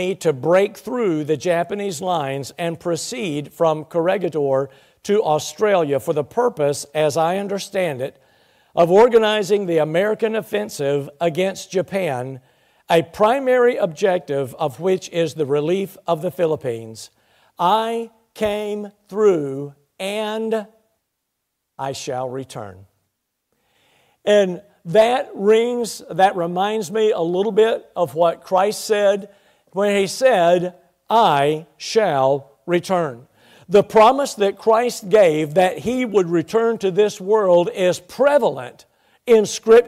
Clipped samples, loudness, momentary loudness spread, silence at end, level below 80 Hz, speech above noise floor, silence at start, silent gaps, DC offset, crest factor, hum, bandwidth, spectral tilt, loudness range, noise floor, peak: under 0.1%; -19 LUFS; 12 LU; 0 s; -60 dBFS; 58 dB; 0 s; none; under 0.1%; 14 dB; none; 15.5 kHz; -5 dB/octave; 6 LU; -76 dBFS; -4 dBFS